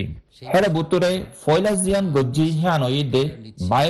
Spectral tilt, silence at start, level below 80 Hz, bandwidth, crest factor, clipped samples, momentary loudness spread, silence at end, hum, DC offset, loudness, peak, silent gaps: -5.5 dB/octave; 0 s; -44 dBFS; 12.5 kHz; 16 dB; under 0.1%; 8 LU; 0 s; none; under 0.1%; -20 LUFS; -4 dBFS; none